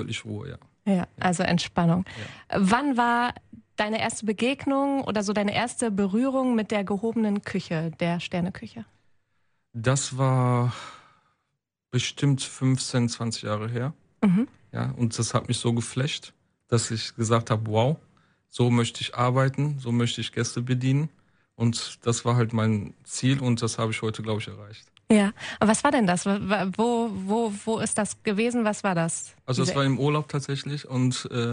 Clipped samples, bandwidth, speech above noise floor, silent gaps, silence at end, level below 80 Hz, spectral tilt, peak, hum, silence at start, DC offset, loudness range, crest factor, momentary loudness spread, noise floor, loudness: under 0.1%; 10.5 kHz; 56 dB; none; 0 s; -60 dBFS; -5.5 dB/octave; -6 dBFS; none; 0 s; under 0.1%; 3 LU; 20 dB; 9 LU; -81 dBFS; -26 LUFS